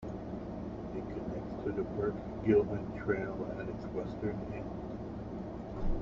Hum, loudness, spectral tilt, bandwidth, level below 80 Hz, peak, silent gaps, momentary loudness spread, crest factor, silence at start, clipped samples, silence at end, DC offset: none; -37 LUFS; -9 dB/octave; 7 kHz; -46 dBFS; -16 dBFS; none; 12 LU; 20 dB; 0 s; under 0.1%; 0 s; under 0.1%